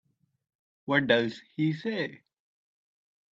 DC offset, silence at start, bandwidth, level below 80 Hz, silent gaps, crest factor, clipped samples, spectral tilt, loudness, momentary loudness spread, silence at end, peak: under 0.1%; 0.85 s; 7.8 kHz; -74 dBFS; none; 24 dB; under 0.1%; -7 dB/octave; -28 LUFS; 12 LU; 1.15 s; -8 dBFS